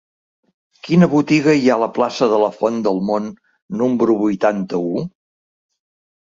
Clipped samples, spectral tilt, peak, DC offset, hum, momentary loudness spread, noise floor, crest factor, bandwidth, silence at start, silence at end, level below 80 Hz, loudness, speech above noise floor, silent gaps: under 0.1%; -7 dB/octave; -2 dBFS; under 0.1%; none; 11 LU; under -90 dBFS; 16 dB; 7.6 kHz; 0.85 s; 1.2 s; -60 dBFS; -17 LUFS; over 74 dB; 3.62-3.69 s